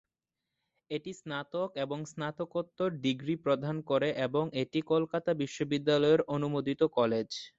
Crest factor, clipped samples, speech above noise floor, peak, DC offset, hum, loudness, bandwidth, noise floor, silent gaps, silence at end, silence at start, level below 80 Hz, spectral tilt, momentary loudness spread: 18 dB; under 0.1%; 58 dB; -14 dBFS; under 0.1%; none; -32 LUFS; 8 kHz; -89 dBFS; none; 0.1 s; 0.9 s; -70 dBFS; -6 dB/octave; 10 LU